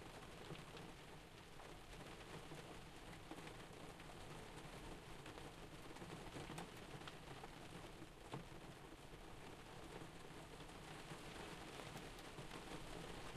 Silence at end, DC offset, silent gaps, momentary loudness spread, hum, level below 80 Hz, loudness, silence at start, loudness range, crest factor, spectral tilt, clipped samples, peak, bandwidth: 0 s; under 0.1%; none; 4 LU; none; -64 dBFS; -56 LUFS; 0 s; 2 LU; 22 dB; -4.5 dB/octave; under 0.1%; -34 dBFS; 13 kHz